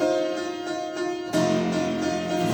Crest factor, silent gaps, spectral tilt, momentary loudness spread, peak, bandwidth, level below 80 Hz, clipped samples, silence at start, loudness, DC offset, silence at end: 14 dB; none; -5 dB/octave; 7 LU; -10 dBFS; over 20 kHz; -60 dBFS; under 0.1%; 0 s; -26 LUFS; under 0.1%; 0 s